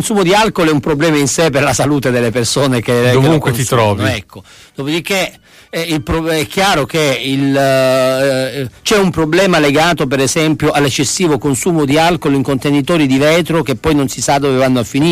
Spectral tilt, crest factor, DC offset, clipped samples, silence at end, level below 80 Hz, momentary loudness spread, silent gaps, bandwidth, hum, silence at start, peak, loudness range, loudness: -4.5 dB/octave; 12 dB; under 0.1%; under 0.1%; 0 s; -38 dBFS; 6 LU; none; 15.5 kHz; none; 0 s; 0 dBFS; 3 LU; -12 LUFS